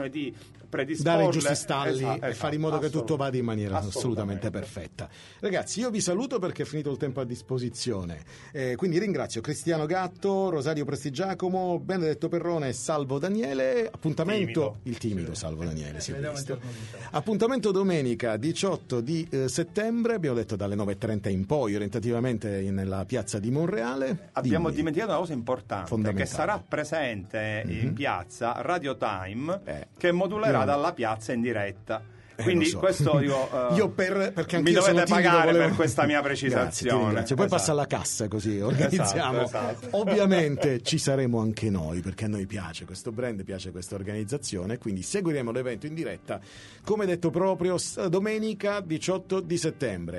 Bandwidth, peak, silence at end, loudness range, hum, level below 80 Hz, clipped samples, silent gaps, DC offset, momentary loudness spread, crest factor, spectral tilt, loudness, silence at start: 11.5 kHz; -8 dBFS; 0 s; 8 LU; none; -56 dBFS; under 0.1%; none; under 0.1%; 10 LU; 20 dB; -5.5 dB/octave; -28 LUFS; 0 s